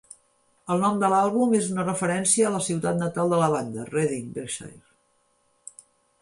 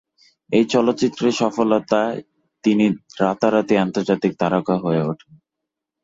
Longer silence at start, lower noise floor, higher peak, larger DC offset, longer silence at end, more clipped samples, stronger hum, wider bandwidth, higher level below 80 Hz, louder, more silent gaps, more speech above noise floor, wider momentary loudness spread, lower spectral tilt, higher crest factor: first, 0.65 s vs 0.5 s; second, -67 dBFS vs -83 dBFS; second, -8 dBFS vs -4 dBFS; neither; first, 1.45 s vs 0.9 s; neither; neither; first, 11.5 kHz vs 7.8 kHz; second, -66 dBFS vs -60 dBFS; second, -24 LUFS vs -19 LUFS; neither; second, 44 dB vs 64 dB; first, 17 LU vs 5 LU; about the same, -5 dB/octave vs -6 dB/octave; about the same, 18 dB vs 16 dB